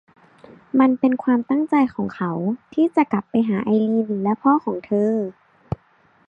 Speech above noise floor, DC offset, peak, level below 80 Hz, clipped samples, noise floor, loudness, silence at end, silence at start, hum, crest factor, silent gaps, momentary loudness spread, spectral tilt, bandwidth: 38 dB; under 0.1%; -4 dBFS; -54 dBFS; under 0.1%; -58 dBFS; -20 LUFS; 0.95 s; 0.75 s; none; 16 dB; none; 8 LU; -9.5 dB/octave; 5.2 kHz